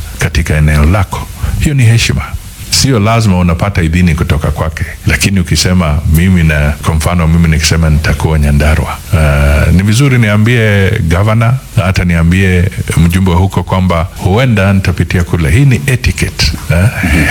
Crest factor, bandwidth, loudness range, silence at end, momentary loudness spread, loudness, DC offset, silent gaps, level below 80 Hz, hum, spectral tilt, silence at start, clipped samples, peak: 8 dB; 18 kHz; 1 LU; 0 s; 5 LU; -10 LUFS; under 0.1%; none; -18 dBFS; none; -5.5 dB/octave; 0 s; 0.4%; 0 dBFS